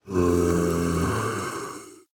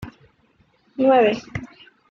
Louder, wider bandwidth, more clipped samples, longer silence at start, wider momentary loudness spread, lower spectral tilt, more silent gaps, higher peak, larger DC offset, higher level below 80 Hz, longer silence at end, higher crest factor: second, -25 LUFS vs -18 LUFS; first, 17.5 kHz vs 7 kHz; neither; about the same, 0.05 s vs 0 s; second, 13 LU vs 23 LU; about the same, -6 dB/octave vs -6.5 dB/octave; neither; second, -10 dBFS vs -6 dBFS; neither; first, -46 dBFS vs -54 dBFS; second, 0.15 s vs 0.45 s; about the same, 14 dB vs 18 dB